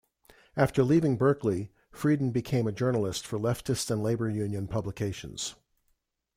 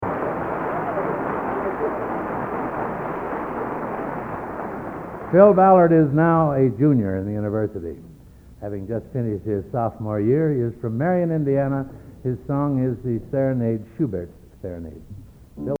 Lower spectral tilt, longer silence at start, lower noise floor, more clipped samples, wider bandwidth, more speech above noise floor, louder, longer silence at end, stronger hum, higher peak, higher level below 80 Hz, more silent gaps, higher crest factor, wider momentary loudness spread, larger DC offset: second, -6 dB/octave vs -11 dB/octave; first, 0.55 s vs 0 s; first, -75 dBFS vs -45 dBFS; neither; first, 16 kHz vs 4.7 kHz; first, 47 dB vs 25 dB; second, -29 LUFS vs -22 LUFS; first, 0.85 s vs 0.05 s; neither; second, -12 dBFS vs 0 dBFS; second, -56 dBFS vs -48 dBFS; neither; about the same, 18 dB vs 22 dB; second, 11 LU vs 17 LU; neither